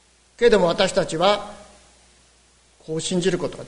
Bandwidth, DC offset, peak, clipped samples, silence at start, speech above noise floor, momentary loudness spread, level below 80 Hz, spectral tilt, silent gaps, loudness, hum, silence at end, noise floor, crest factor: 11 kHz; under 0.1%; -2 dBFS; under 0.1%; 0.4 s; 37 dB; 11 LU; -48 dBFS; -4.5 dB/octave; none; -20 LUFS; none; 0 s; -57 dBFS; 20 dB